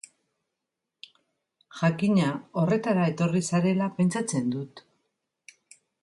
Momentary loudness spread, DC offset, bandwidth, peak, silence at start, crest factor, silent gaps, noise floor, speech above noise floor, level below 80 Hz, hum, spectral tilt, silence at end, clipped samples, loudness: 7 LU; under 0.1%; 11.5 kHz; -12 dBFS; 1.75 s; 16 dB; none; -85 dBFS; 60 dB; -68 dBFS; none; -6.5 dB/octave; 1.25 s; under 0.1%; -26 LUFS